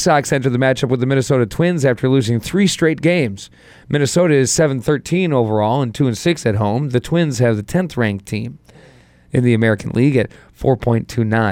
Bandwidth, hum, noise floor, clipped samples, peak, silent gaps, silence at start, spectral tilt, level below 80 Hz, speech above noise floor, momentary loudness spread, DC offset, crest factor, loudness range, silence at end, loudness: 16.5 kHz; none; -47 dBFS; under 0.1%; -2 dBFS; none; 0 s; -6 dB/octave; -44 dBFS; 31 dB; 5 LU; under 0.1%; 14 dB; 3 LU; 0 s; -17 LUFS